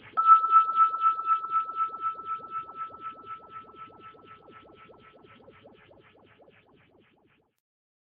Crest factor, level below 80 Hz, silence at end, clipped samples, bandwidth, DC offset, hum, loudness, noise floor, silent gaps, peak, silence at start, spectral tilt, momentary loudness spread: 22 dB; -76 dBFS; 3.65 s; under 0.1%; 4.2 kHz; under 0.1%; none; -24 LUFS; -67 dBFS; none; -8 dBFS; 0.05 s; -6 dB/octave; 26 LU